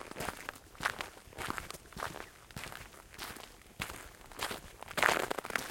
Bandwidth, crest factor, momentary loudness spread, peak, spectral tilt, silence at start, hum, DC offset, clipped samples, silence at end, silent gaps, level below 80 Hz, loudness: 17 kHz; 32 dB; 18 LU; -8 dBFS; -2.5 dB/octave; 0 s; none; under 0.1%; under 0.1%; 0 s; none; -58 dBFS; -38 LUFS